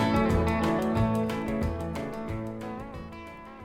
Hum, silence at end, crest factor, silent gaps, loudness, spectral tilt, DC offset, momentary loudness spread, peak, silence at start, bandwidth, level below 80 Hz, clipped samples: none; 0 s; 18 dB; none; -29 LUFS; -7 dB/octave; under 0.1%; 16 LU; -12 dBFS; 0 s; 16 kHz; -40 dBFS; under 0.1%